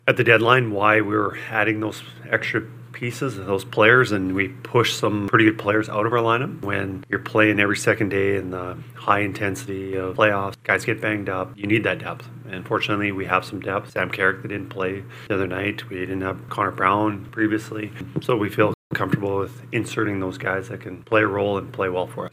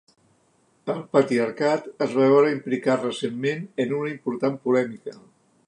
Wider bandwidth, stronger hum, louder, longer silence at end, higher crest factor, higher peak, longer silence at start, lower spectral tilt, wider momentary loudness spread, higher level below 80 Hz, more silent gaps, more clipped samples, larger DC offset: first, 16 kHz vs 10.5 kHz; neither; about the same, -22 LUFS vs -23 LUFS; second, 0.05 s vs 0.5 s; about the same, 22 dB vs 18 dB; first, 0 dBFS vs -6 dBFS; second, 0.05 s vs 0.85 s; about the same, -5.5 dB/octave vs -6.5 dB/octave; about the same, 12 LU vs 13 LU; first, -62 dBFS vs -74 dBFS; first, 18.74-18.90 s vs none; neither; neither